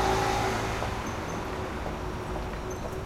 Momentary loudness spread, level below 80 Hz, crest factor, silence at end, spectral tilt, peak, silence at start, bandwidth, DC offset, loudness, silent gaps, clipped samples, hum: 8 LU; -40 dBFS; 16 dB; 0 s; -5 dB/octave; -14 dBFS; 0 s; 16.5 kHz; under 0.1%; -31 LUFS; none; under 0.1%; none